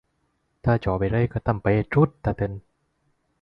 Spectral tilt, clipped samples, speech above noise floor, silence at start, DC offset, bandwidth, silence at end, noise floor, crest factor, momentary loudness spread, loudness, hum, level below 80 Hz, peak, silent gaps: -10.5 dB/octave; under 0.1%; 49 dB; 0.65 s; under 0.1%; 5.4 kHz; 0.85 s; -71 dBFS; 18 dB; 8 LU; -24 LUFS; none; -42 dBFS; -6 dBFS; none